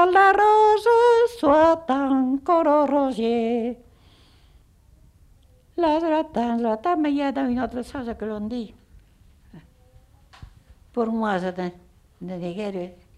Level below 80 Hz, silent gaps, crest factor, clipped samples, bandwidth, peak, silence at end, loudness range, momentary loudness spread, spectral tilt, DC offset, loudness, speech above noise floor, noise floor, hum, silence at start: -52 dBFS; none; 16 dB; under 0.1%; 12 kHz; -6 dBFS; 0.25 s; 12 LU; 16 LU; -6 dB/octave; under 0.1%; -21 LUFS; 34 dB; -55 dBFS; none; 0 s